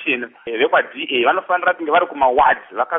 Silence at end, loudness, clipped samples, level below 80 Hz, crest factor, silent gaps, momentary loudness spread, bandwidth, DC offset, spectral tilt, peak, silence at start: 0 s; -17 LUFS; under 0.1%; -54 dBFS; 16 dB; none; 6 LU; 3.9 kHz; under 0.1%; 0 dB/octave; -2 dBFS; 0 s